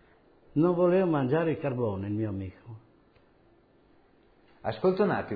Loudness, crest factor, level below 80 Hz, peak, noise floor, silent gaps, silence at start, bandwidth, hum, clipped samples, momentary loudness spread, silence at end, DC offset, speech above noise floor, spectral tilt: -28 LUFS; 18 dB; -64 dBFS; -12 dBFS; -62 dBFS; none; 0.55 s; 5 kHz; none; under 0.1%; 14 LU; 0 s; under 0.1%; 35 dB; -11 dB/octave